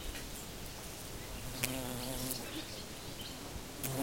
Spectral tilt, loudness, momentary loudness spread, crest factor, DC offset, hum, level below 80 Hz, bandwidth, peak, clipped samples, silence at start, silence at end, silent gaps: -3 dB/octave; -41 LUFS; 8 LU; 30 dB; 0.1%; none; -52 dBFS; 16.5 kHz; -12 dBFS; under 0.1%; 0 s; 0 s; none